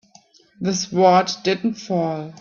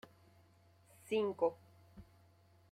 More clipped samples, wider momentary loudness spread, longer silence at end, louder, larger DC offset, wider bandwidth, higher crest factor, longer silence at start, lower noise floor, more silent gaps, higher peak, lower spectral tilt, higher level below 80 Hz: neither; second, 10 LU vs 26 LU; second, 0.05 s vs 0.7 s; first, -20 LUFS vs -38 LUFS; neither; second, 7.2 kHz vs 14.5 kHz; about the same, 18 dB vs 20 dB; second, 0.6 s vs 1.05 s; second, -53 dBFS vs -67 dBFS; neither; first, -2 dBFS vs -22 dBFS; about the same, -5 dB/octave vs -5.5 dB/octave; first, -62 dBFS vs -74 dBFS